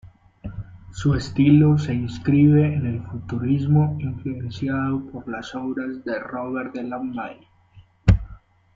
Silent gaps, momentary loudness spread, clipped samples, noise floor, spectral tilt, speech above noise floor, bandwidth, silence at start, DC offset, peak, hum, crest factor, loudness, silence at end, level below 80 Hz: none; 18 LU; under 0.1%; -52 dBFS; -8.5 dB/octave; 31 dB; 7.6 kHz; 0.05 s; under 0.1%; -2 dBFS; none; 20 dB; -22 LUFS; 0.4 s; -38 dBFS